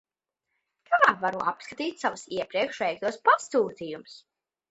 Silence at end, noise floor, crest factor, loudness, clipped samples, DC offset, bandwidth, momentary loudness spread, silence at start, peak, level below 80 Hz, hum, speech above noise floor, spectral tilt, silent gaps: 0.55 s; -84 dBFS; 22 dB; -26 LUFS; under 0.1%; under 0.1%; 8.2 kHz; 12 LU; 0.9 s; -6 dBFS; -72 dBFS; none; 56 dB; -3.5 dB/octave; none